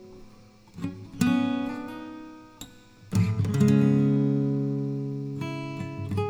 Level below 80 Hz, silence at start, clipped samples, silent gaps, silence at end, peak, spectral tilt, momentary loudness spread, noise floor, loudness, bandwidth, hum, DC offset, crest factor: -56 dBFS; 0 s; under 0.1%; none; 0 s; -10 dBFS; -7.5 dB/octave; 22 LU; -51 dBFS; -26 LUFS; 15.5 kHz; none; under 0.1%; 18 dB